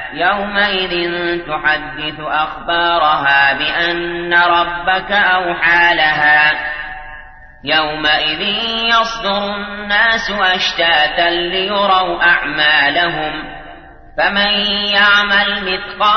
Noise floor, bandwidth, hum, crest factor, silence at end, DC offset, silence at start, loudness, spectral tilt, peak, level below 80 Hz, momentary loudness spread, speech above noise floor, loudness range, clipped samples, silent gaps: -36 dBFS; 6.6 kHz; none; 14 dB; 0 s; under 0.1%; 0 s; -13 LUFS; -3.5 dB/octave; 0 dBFS; -40 dBFS; 10 LU; 22 dB; 3 LU; under 0.1%; none